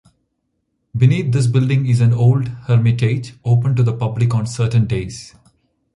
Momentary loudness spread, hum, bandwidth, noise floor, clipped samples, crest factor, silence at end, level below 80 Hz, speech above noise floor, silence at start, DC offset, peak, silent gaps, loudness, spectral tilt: 7 LU; none; 11 kHz; -70 dBFS; under 0.1%; 14 dB; 0.7 s; -44 dBFS; 55 dB; 0.95 s; under 0.1%; -2 dBFS; none; -16 LUFS; -7.5 dB/octave